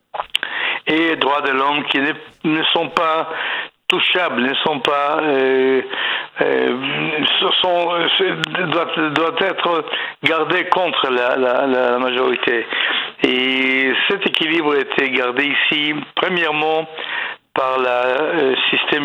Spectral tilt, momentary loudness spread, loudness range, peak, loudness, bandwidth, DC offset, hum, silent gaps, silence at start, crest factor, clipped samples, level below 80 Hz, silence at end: -4.5 dB/octave; 5 LU; 2 LU; 0 dBFS; -17 LUFS; 10.5 kHz; under 0.1%; none; none; 0.15 s; 18 dB; under 0.1%; -66 dBFS; 0 s